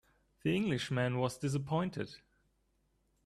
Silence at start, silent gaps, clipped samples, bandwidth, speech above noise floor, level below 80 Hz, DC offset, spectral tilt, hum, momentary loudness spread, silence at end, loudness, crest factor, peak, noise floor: 0.45 s; none; under 0.1%; 13 kHz; 42 dB; -66 dBFS; under 0.1%; -6 dB/octave; none; 7 LU; 1.1 s; -35 LUFS; 18 dB; -18 dBFS; -76 dBFS